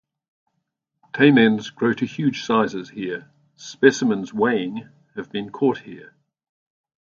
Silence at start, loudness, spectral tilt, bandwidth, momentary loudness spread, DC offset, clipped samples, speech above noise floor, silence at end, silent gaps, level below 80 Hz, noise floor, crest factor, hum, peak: 1.15 s; -20 LUFS; -5.5 dB/octave; 7.6 kHz; 19 LU; under 0.1%; under 0.1%; 57 dB; 1.05 s; none; -66 dBFS; -77 dBFS; 22 dB; none; 0 dBFS